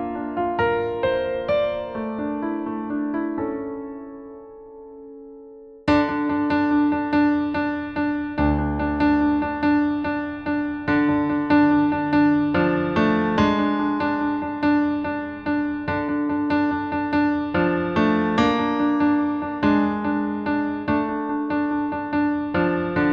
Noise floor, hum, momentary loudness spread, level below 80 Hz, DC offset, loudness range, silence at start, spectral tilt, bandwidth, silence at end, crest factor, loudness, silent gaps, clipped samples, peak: -43 dBFS; none; 8 LU; -44 dBFS; under 0.1%; 7 LU; 0 s; -8 dB/octave; 6.4 kHz; 0 s; 16 dB; -22 LUFS; none; under 0.1%; -6 dBFS